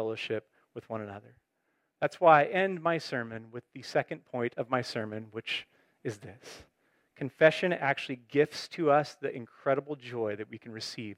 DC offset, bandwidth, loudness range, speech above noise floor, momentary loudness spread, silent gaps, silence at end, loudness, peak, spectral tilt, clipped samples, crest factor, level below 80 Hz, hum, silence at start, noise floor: under 0.1%; 13.5 kHz; 7 LU; 47 dB; 19 LU; none; 0.05 s; -30 LUFS; -8 dBFS; -5.5 dB/octave; under 0.1%; 24 dB; -78 dBFS; none; 0 s; -78 dBFS